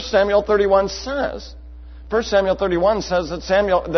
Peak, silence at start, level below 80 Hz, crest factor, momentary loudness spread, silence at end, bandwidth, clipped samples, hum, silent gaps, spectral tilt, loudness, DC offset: -4 dBFS; 0 s; -38 dBFS; 16 dB; 8 LU; 0 s; 6.4 kHz; under 0.1%; none; none; -5 dB/octave; -19 LUFS; under 0.1%